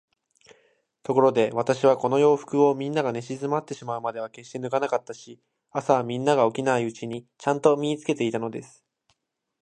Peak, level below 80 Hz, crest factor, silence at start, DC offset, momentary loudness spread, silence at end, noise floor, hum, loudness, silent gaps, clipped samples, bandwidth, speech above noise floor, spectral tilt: -4 dBFS; -72 dBFS; 20 dB; 1.1 s; under 0.1%; 14 LU; 1 s; -74 dBFS; none; -24 LUFS; none; under 0.1%; 9.6 kHz; 50 dB; -6 dB/octave